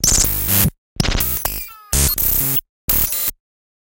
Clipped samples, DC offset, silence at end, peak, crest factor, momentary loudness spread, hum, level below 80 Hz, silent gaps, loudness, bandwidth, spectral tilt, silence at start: under 0.1%; under 0.1%; 0.5 s; 0 dBFS; 18 dB; 8 LU; none; -28 dBFS; 0.78-0.96 s, 2.69-2.88 s; -16 LUFS; 18 kHz; -2.5 dB/octave; 0 s